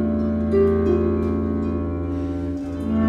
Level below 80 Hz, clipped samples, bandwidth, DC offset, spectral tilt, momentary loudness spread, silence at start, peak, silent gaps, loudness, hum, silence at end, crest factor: -34 dBFS; under 0.1%; 6 kHz; under 0.1%; -10 dB/octave; 8 LU; 0 s; -8 dBFS; none; -22 LUFS; none; 0 s; 14 dB